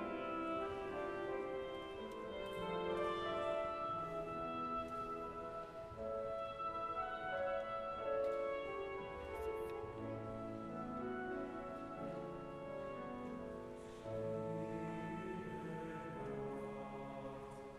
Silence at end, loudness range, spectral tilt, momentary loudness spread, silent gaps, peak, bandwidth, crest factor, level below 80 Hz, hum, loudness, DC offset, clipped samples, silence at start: 0 s; 4 LU; -6.5 dB/octave; 8 LU; none; -30 dBFS; 13 kHz; 14 dB; -64 dBFS; none; -44 LUFS; under 0.1%; under 0.1%; 0 s